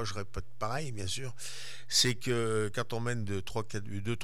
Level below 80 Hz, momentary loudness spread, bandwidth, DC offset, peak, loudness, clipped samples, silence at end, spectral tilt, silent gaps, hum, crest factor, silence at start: -56 dBFS; 14 LU; 17.5 kHz; 2%; -14 dBFS; -33 LUFS; under 0.1%; 0 s; -3.5 dB/octave; none; none; 20 dB; 0 s